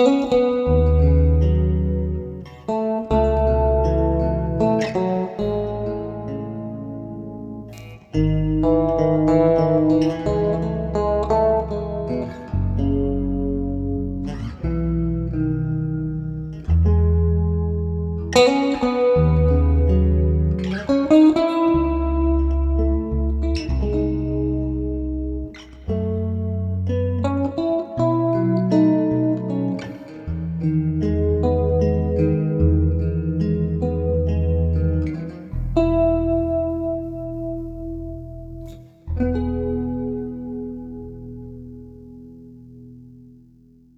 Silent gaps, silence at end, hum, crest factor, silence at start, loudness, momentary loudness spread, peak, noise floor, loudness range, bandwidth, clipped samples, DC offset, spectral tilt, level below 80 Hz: none; 0.7 s; none; 18 dB; 0 s; -21 LUFS; 14 LU; -2 dBFS; -51 dBFS; 9 LU; 8.2 kHz; under 0.1%; under 0.1%; -8.5 dB/octave; -28 dBFS